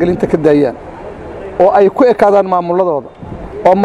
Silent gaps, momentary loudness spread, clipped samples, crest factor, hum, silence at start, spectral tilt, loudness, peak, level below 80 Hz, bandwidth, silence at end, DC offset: none; 20 LU; 0.2%; 12 dB; none; 0 s; -8 dB/octave; -11 LUFS; 0 dBFS; -38 dBFS; 11 kHz; 0 s; under 0.1%